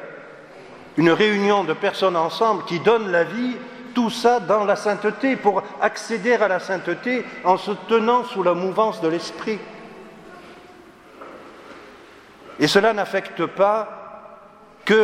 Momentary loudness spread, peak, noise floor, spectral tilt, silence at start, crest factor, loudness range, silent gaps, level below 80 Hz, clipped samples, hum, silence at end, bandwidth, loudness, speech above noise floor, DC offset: 23 LU; -2 dBFS; -46 dBFS; -5 dB/octave; 0 s; 20 dB; 7 LU; none; -66 dBFS; under 0.1%; none; 0 s; 15 kHz; -20 LUFS; 27 dB; under 0.1%